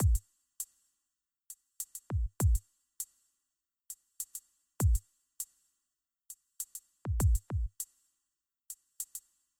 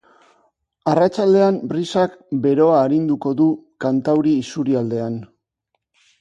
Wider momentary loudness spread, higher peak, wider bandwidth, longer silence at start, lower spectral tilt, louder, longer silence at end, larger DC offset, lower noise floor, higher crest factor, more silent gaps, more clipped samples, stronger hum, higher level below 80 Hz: first, 18 LU vs 9 LU; second, -18 dBFS vs -2 dBFS; first, 18 kHz vs 9 kHz; second, 0 s vs 0.85 s; second, -5.5 dB/octave vs -7.5 dB/octave; second, -36 LUFS vs -18 LUFS; second, 0.4 s vs 0.95 s; neither; first, -88 dBFS vs -75 dBFS; about the same, 18 dB vs 16 dB; neither; neither; neither; first, -38 dBFS vs -62 dBFS